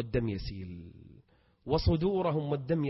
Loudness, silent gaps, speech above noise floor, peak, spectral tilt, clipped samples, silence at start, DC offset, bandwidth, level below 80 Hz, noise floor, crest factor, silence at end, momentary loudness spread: -31 LUFS; none; 32 dB; -14 dBFS; -10 dB/octave; under 0.1%; 0 s; under 0.1%; 6 kHz; -44 dBFS; -63 dBFS; 18 dB; 0 s; 19 LU